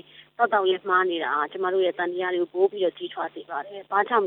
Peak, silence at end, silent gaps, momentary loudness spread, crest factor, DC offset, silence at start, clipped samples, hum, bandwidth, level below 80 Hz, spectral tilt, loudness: -8 dBFS; 0 s; none; 11 LU; 16 dB; under 0.1%; 0.2 s; under 0.1%; none; 4.1 kHz; -82 dBFS; -7.5 dB/octave; -25 LUFS